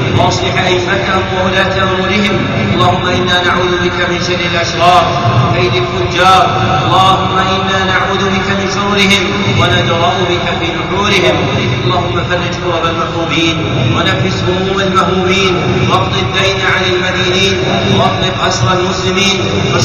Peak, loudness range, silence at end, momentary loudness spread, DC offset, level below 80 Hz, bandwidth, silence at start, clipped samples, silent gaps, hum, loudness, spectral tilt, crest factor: 0 dBFS; 2 LU; 0 s; 5 LU; 0.4%; -32 dBFS; 13 kHz; 0 s; under 0.1%; none; none; -11 LUFS; -5 dB/octave; 12 dB